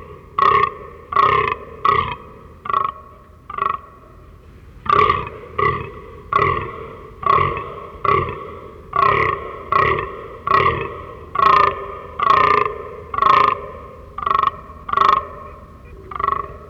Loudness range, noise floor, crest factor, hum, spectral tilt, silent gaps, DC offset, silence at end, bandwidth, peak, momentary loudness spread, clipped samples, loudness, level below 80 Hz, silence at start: 5 LU; -42 dBFS; 18 dB; none; -6 dB/octave; none; under 0.1%; 0 s; 7.4 kHz; -2 dBFS; 19 LU; under 0.1%; -18 LUFS; -42 dBFS; 0 s